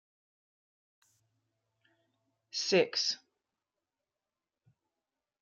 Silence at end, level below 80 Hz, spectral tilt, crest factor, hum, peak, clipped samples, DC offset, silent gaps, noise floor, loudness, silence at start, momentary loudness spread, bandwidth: 2.25 s; -88 dBFS; -3 dB/octave; 26 dB; none; -14 dBFS; under 0.1%; under 0.1%; none; under -90 dBFS; -31 LUFS; 2.55 s; 13 LU; 11 kHz